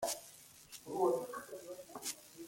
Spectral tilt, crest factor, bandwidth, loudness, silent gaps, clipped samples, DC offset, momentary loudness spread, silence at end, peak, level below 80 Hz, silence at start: -3 dB/octave; 20 dB; 16.5 kHz; -40 LUFS; none; under 0.1%; under 0.1%; 18 LU; 0 s; -22 dBFS; -78 dBFS; 0 s